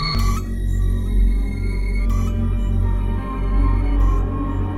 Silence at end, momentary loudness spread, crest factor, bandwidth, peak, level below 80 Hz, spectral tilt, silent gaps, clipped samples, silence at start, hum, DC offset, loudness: 0 s; 4 LU; 10 dB; 12 kHz; -8 dBFS; -20 dBFS; -6.5 dB/octave; none; under 0.1%; 0 s; none; under 0.1%; -22 LUFS